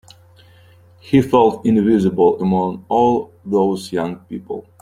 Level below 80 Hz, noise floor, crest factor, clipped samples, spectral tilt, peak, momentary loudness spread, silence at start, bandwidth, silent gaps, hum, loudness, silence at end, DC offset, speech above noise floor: -52 dBFS; -47 dBFS; 16 dB; under 0.1%; -8 dB/octave; 0 dBFS; 13 LU; 1.05 s; 14.5 kHz; none; none; -17 LUFS; 0.2 s; under 0.1%; 31 dB